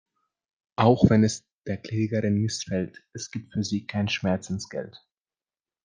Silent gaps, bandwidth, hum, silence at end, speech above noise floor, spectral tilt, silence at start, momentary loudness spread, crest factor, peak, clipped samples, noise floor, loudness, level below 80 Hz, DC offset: 1.53-1.59 s; 9.8 kHz; none; 0.95 s; over 65 dB; -6 dB/octave; 0.8 s; 16 LU; 22 dB; -4 dBFS; under 0.1%; under -90 dBFS; -26 LUFS; -56 dBFS; under 0.1%